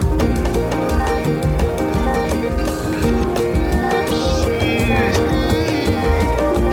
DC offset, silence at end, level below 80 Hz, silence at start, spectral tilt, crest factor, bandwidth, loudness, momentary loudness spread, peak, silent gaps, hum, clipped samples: under 0.1%; 0 s; -24 dBFS; 0 s; -6 dB/octave; 14 dB; 17 kHz; -18 LUFS; 3 LU; -4 dBFS; none; none; under 0.1%